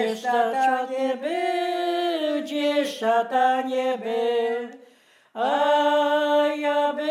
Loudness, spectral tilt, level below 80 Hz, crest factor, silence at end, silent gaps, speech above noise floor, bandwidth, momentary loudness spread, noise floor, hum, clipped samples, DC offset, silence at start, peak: -23 LUFS; -3 dB/octave; under -90 dBFS; 14 dB; 0 s; none; 34 dB; 14.5 kHz; 6 LU; -56 dBFS; none; under 0.1%; under 0.1%; 0 s; -10 dBFS